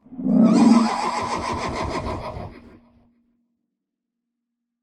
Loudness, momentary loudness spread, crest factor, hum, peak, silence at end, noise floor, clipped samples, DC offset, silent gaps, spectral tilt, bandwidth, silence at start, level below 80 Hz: -20 LUFS; 18 LU; 18 dB; none; -4 dBFS; 2.15 s; -82 dBFS; under 0.1%; under 0.1%; none; -6 dB/octave; 10.5 kHz; 0.1 s; -44 dBFS